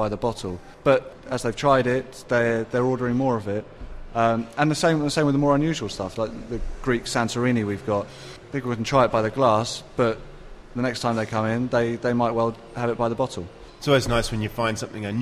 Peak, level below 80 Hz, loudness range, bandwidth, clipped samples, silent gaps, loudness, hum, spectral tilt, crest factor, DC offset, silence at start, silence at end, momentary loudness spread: -6 dBFS; -44 dBFS; 2 LU; 15 kHz; under 0.1%; none; -24 LUFS; none; -5.5 dB/octave; 18 dB; under 0.1%; 0 s; 0 s; 11 LU